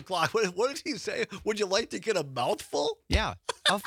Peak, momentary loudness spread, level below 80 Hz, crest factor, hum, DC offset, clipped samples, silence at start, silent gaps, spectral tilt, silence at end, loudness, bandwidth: -10 dBFS; 5 LU; -42 dBFS; 20 dB; none; under 0.1%; under 0.1%; 0 s; none; -3.5 dB/octave; 0 s; -29 LUFS; 18 kHz